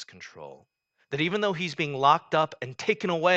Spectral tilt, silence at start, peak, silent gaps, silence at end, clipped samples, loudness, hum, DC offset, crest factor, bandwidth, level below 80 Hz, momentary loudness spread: -5 dB/octave; 0 s; -6 dBFS; none; 0 s; under 0.1%; -26 LUFS; none; under 0.1%; 20 dB; 8.4 kHz; -72 dBFS; 21 LU